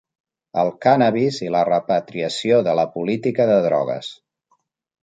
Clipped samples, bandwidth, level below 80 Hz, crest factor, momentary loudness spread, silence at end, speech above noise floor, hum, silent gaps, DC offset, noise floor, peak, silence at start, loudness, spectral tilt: under 0.1%; 9.2 kHz; -66 dBFS; 18 dB; 9 LU; 0.9 s; 48 dB; none; none; under 0.1%; -67 dBFS; -2 dBFS; 0.55 s; -19 LUFS; -6 dB/octave